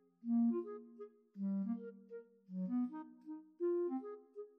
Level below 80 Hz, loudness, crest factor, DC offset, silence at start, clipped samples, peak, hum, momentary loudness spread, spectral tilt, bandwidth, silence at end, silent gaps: under -90 dBFS; -40 LUFS; 14 dB; under 0.1%; 0.25 s; under 0.1%; -28 dBFS; none; 19 LU; -12 dB/octave; 2.6 kHz; 0.1 s; none